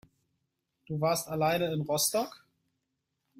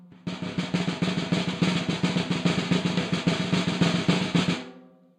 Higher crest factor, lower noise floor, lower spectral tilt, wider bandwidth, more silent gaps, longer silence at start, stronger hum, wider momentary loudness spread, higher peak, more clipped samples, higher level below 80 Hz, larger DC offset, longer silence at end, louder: about the same, 18 dB vs 18 dB; first, -83 dBFS vs -50 dBFS; second, -4 dB/octave vs -5.5 dB/octave; first, 16 kHz vs 10 kHz; neither; first, 0.9 s vs 0 s; neither; about the same, 8 LU vs 8 LU; second, -16 dBFS vs -8 dBFS; neither; second, -68 dBFS vs -58 dBFS; neither; first, 1 s vs 0.35 s; second, -30 LUFS vs -26 LUFS